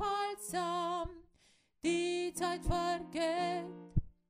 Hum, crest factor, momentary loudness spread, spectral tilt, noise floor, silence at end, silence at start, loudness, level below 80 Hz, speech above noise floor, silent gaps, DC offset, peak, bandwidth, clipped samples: none; 18 dB; 6 LU; -5 dB/octave; -70 dBFS; 0.2 s; 0 s; -36 LUFS; -48 dBFS; 35 dB; none; under 0.1%; -18 dBFS; 15.5 kHz; under 0.1%